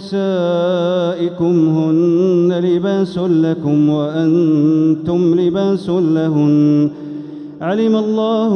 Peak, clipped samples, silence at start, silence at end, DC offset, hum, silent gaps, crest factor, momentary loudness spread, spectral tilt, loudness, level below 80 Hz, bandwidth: -4 dBFS; under 0.1%; 0 s; 0 s; under 0.1%; none; none; 10 dB; 5 LU; -8.5 dB/octave; -15 LUFS; -56 dBFS; 6.6 kHz